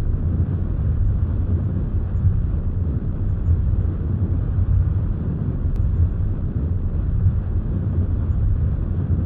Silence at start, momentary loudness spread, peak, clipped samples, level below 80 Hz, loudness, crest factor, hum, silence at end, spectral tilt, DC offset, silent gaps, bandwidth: 0 s; 3 LU; -8 dBFS; under 0.1%; -24 dBFS; -22 LUFS; 12 dB; none; 0 s; -13 dB/octave; 0.3%; none; 2.1 kHz